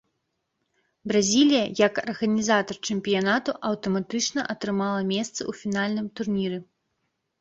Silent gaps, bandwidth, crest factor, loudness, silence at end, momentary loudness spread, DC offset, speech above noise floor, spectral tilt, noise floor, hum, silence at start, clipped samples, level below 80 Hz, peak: none; 8.2 kHz; 20 dB; -25 LUFS; 0.8 s; 8 LU; under 0.1%; 53 dB; -4 dB/octave; -78 dBFS; none; 1.05 s; under 0.1%; -64 dBFS; -6 dBFS